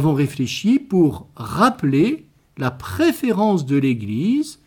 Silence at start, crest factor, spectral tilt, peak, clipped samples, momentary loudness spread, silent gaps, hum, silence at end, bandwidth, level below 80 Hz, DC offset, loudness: 0 s; 16 dB; -6.5 dB/octave; -4 dBFS; under 0.1%; 9 LU; none; none; 0.15 s; 19 kHz; -52 dBFS; under 0.1%; -19 LUFS